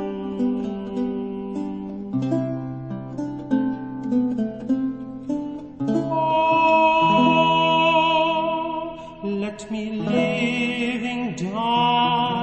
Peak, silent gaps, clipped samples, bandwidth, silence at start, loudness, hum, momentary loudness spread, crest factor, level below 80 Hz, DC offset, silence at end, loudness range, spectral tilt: -6 dBFS; none; under 0.1%; 8.6 kHz; 0 s; -22 LUFS; none; 14 LU; 16 dB; -54 dBFS; under 0.1%; 0 s; 9 LU; -6 dB/octave